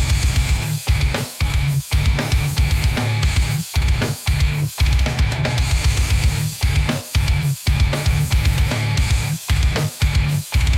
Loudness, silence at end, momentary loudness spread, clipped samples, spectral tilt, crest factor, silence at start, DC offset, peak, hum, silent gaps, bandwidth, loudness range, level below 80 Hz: -19 LUFS; 0 s; 2 LU; under 0.1%; -4.5 dB/octave; 10 dB; 0 s; under 0.1%; -6 dBFS; none; none; 16.5 kHz; 1 LU; -20 dBFS